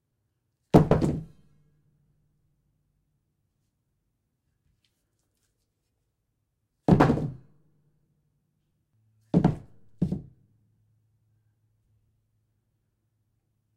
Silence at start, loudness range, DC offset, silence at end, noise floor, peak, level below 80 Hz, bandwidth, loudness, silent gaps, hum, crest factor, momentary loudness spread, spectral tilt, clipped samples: 0.75 s; 12 LU; under 0.1%; 3.55 s; -78 dBFS; -4 dBFS; -48 dBFS; 12 kHz; -25 LUFS; none; none; 26 dB; 16 LU; -9 dB/octave; under 0.1%